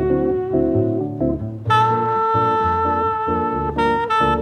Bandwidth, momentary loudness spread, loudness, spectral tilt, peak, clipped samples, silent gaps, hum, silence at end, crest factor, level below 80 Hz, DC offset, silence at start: 11.5 kHz; 5 LU; -19 LUFS; -7.5 dB/octave; -4 dBFS; under 0.1%; none; none; 0 s; 16 dB; -38 dBFS; under 0.1%; 0 s